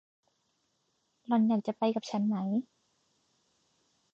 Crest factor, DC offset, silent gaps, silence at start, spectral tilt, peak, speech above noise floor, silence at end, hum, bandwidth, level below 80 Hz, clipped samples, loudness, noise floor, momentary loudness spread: 16 dB; under 0.1%; none; 1.3 s; -7.5 dB/octave; -18 dBFS; 47 dB; 1.5 s; none; 7.4 kHz; -84 dBFS; under 0.1%; -31 LUFS; -77 dBFS; 5 LU